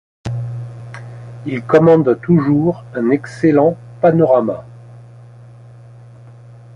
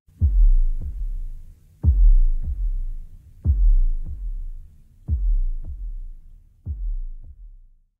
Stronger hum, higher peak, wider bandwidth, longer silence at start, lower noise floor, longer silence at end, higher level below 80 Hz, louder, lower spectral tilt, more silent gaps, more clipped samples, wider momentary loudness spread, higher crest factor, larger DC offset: first, 60 Hz at -35 dBFS vs none; first, 0 dBFS vs -6 dBFS; first, 10 kHz vs 0.6 kHz; about the same, 0.25 s vs 0.2 s; second, -39 dBFS vs -48 dBFS; first, 1.75 s vs 0.5 s; second, -50 dBFS vs -20 dBFS; first, -15 LUFS vs -26 LUFS; second, -9.5 dB/octave vs -11 dB/octave; neither; neither; about the same, 19 LU vs 21 LU; about the same, 16 dB vs 14 dB; neither